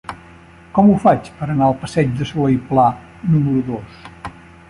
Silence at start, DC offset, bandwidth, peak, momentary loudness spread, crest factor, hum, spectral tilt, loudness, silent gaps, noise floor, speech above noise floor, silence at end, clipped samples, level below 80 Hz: 0.1 s; under 0.1%; 11 kHz; -2 dBFS; 20 LU; 16 dB; none; -8.5 dB/octave; -17 LUFS; none; -42 dBFS; 27 dB; 0.4 s; under 0.1%; -44 dBFS